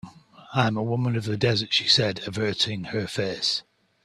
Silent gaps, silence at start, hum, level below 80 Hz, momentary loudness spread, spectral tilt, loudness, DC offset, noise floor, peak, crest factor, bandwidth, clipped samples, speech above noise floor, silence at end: none; 0.05 s; none; -60 dBFS; 9 LU; -4.5 dB/octave; -24 LUFS; under 0.1%; -47 dBFS; -4 dBFS; 20 dB; 12.5 kHz; under 0.1%; 22 dB; 0.45 s